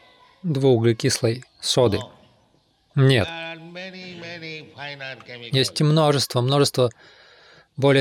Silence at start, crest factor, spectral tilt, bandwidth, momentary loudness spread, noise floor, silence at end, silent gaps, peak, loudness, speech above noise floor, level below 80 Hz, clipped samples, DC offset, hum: 0.45 s; 16 dB; -5 dB/octave; 15.5 kHz; 17 LU; -62 dBFS; 0 s; none; -6 dBFS; -21 LUFS; 41 dB; -58 dBFS; under 0.1%; under 0.1%; none